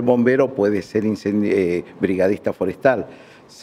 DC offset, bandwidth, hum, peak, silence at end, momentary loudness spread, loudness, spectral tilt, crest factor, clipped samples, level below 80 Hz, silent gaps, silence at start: under 0.1%; 13 kHz; none; -2 dBFS; 0 s; 6 LU; -20 LUFS; -7.5 dB/octave; 16 dB; under 0.1%; -58 dBFS; none; 0 s